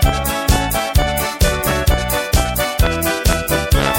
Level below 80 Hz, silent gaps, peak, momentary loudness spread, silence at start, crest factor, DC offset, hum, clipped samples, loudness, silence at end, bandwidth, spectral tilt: -20 dBFS; none; 0 dBFS; 2 LU; 0 s; 16 dB; under 0.1%; none; under 0.1%; -17 LUFS; 0 s; 17 kHz; -4 dB/octave